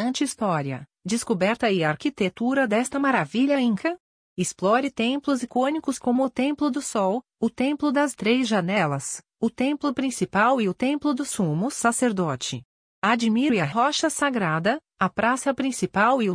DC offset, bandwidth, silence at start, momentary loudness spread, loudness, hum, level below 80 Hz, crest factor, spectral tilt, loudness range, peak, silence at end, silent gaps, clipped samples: under 0.1%; 10.5 kHz; 0 s; 7 LU; -24 LUFS; none; -62 dBFS; 18 dB; -4.5 dB/octave; 1 LU; -6 dBFS; 0 s; 4.00-4.36 s, 12.65-13.02 s; under 0.1%